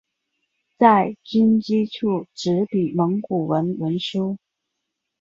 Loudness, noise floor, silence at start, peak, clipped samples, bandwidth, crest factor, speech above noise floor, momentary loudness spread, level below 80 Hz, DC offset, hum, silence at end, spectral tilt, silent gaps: -21 LUFS; -80 dBFS; 0.8 s; -2 dBFS; under 0.1%; 7.6 kHz; 20 dB; 60 dB; 9 LU; -62 dBFS; under 0.1%; none; 0.85 s; -7 dB/octave; none